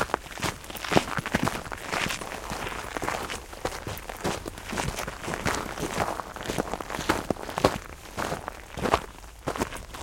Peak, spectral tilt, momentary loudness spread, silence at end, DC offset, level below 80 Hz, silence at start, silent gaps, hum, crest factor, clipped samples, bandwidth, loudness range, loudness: -2 dBFS; -4 dB/octave; 9 LU; 0 s; under 0.1%; -44 dBFS; 0 s; none; none; 30 dB; under 0.1%; 17 kHz; 3 LU; -30 LUFS